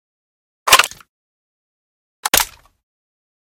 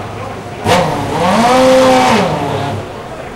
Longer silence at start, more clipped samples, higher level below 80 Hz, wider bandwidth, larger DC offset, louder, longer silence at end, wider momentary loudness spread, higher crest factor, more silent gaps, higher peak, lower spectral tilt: first, 0.65 s vs 0 s; first, 0.1% vs under 0.1%; second, -48 dBFS vs -38 dBFS; about the same, 17 kHz vs 16 kHz; neither; second, -15 LUFS vs -11 LUFS; first, 0.95 s vs 0 s; about the same, 14 LU vs 16 LU; first, 22 dB vs 12 dB; first, 1.09-2.23 s vs none; about the same, 0 dBFS vs -2 dBFS; second, 1 dB/octave vs -5 dB/octave